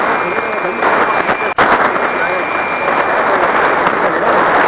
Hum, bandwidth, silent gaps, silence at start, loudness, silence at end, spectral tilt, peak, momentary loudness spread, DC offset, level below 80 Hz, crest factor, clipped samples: none; 4 kHz; none; 0 s; -13 LUFS; 0 s; -8 dB/octave; -2 dBFS; 4 LU; under 0.1%; -46 dBFS; 10 dB; under 0.1%